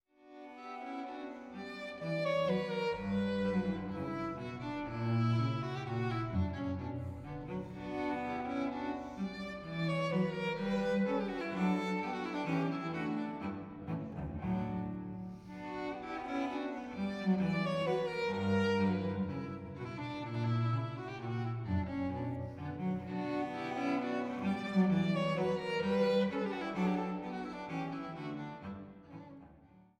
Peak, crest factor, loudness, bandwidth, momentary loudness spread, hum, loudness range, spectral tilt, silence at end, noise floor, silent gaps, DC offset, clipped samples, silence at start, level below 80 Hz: -20 dBFS; 16 dB; -36 LUFS; 9.2 kHz; 11 LU; none; 6 LU; -7.5 dB/octave; 0.2 s; -61 dBFS; none; under 0.1%; under 0.1%; 0.25 s; -60 dBFS